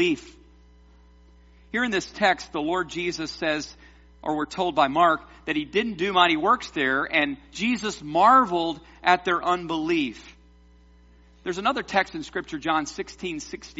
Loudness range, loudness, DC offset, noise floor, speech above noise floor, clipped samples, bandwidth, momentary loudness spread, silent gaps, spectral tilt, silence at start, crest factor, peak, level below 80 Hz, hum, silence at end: 6 LU; -24 LUFS; under 0.1%; -53 dBFS; 29 dB; under 0.1%; 8 kHz; 13 LU; none; -2 dB/octave; 0 s; 22 dB; -2 dBFS; -54 dBFS; none; 0.05 s